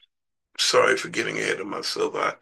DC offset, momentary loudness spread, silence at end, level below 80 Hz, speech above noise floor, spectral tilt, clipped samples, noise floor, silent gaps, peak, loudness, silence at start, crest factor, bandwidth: under 0.1%; 9 LU; 0.05 s; -74 dBFS; 54 dB; -2 dB/octave; under 0.1%; -79 dBFS; none; -6 dBFS; -23 LUFS; 0.6 s; 20 dB; 12.5 kHz